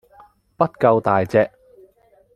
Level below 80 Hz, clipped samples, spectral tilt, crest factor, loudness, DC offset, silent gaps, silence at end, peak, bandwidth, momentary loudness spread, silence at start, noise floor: -58 dBFS; under 0.1%; -8.5 dB/octave; 20 dB; -19 LUFS; under 0.1%; none; 0.9 s; -2 dBFS; 10 kHz; 7 LU; 0.6 s; -56 dBFS